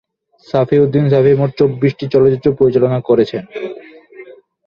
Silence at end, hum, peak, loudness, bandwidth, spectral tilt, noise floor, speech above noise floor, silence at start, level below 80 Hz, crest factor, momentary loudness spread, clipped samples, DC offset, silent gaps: 0.35 s; none; -2 dBFS; -13 LUFS; 6.4 kHz; -9.5 dB/octave; -38 dBFS; 26 dB; 0.55 s; -50 dBFS; 12 dB; 14 LU; under 0.1%; under 0.1%; none